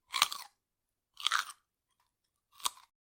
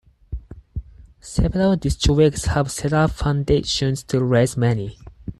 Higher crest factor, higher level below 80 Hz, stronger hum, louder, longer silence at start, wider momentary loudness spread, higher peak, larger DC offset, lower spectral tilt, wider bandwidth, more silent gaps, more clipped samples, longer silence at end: first, 34 dB vs 16 dB; second, -82 dBFS vs -32 dBFS; neither; second, -34 LUFS vs -20 LUFS; second, 0.1 s vs 0.3 s; second, 14 LU vs 18 LU; about the same, -6 dBFS vs -6 dBFS; neither; second, 3 dB/octave vs -6 dB/octave; first, 17 kHz vs 12.5 kHz; neither; neither; first, 0.45 s vs 0.05 s